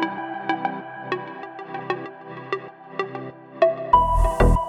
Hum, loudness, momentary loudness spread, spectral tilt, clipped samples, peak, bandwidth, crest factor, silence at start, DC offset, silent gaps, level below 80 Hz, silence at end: none; -24 LUFS; 18 LU; -7 dB/octave; under 0.1%; -2 dBFS; 12 kHz; 20 dB; 0 s; under 0.1%; none; -28 dBFS; 0 s